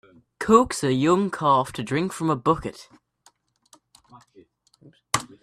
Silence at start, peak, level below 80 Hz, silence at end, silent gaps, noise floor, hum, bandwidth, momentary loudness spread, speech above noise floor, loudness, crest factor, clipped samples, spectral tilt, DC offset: 0.4 s; -2 dBFS; -54 dBFS; 0.2 s; none; -61 dBFS; none; 14 kHz; 9 LU; 40 dB; -22 LUFS; 24 dB; under 0.1%; -5.5 dB/octave; under 0.1%